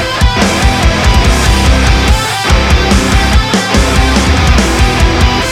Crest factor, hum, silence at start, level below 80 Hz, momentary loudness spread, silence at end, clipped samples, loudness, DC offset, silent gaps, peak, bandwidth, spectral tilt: 8 dB; none; 0 s; -12 dBFS; 1 LU; 0 s; under 0.1%; -9 LUFS; 0.3%; none; 0 dBFS; 15.5 kHz; -4.5 dB/octave